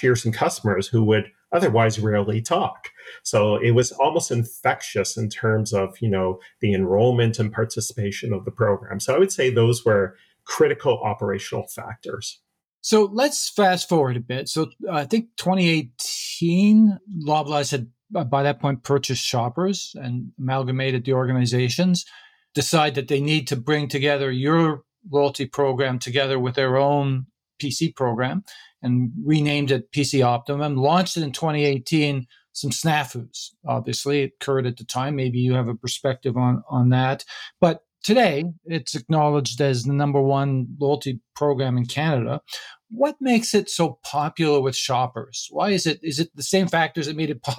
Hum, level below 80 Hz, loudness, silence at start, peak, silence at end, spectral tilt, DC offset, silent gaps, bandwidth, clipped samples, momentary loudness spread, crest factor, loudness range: none; -62 dBFS; -22 LUFS; 0 s; -4 dBFS; 0 s; -5.5 dB/octave; under 0.1%; 12.74-12.80 s; 16 kHz; under 0.1%; 10 LU; 18 dB; 3 LU